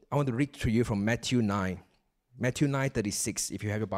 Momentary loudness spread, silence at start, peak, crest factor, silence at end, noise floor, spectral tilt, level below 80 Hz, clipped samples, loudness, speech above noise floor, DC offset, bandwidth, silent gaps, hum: 5 LU; 0.1 s; -14 dBFS; 16 dB; 0 s; -66 dBFS; -5 dB/octave; -50 dBFS; under 0.1%; -30 LUFS; 37 dB; under 0.1%; 16 kHz; none; none